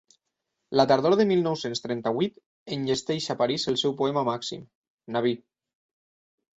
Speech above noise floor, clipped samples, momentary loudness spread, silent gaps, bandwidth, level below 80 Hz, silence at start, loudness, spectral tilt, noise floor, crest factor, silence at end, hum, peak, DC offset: 56 dB; under 0.1%; 11 LU; 2.46-2.66 s, 4.75-4.82 s, 4.90-4.98 s; 8.2 kHz; -66 dBFS; 0.7 s; -26 LUFS; -5 dB/octave; -82 dBFS; 20 dB; 1.2 s; none; -8 dBFS; under 0.1%